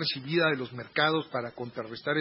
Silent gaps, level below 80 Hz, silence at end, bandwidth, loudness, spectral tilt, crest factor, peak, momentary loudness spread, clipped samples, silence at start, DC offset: none; -72 dBFS; 0 s; 5.8 kHz; -29 LUFS; -9 dB/octave; 20 dB; -10 dBFS; 11 LU; under 0.1%; 0 s; under 0.1%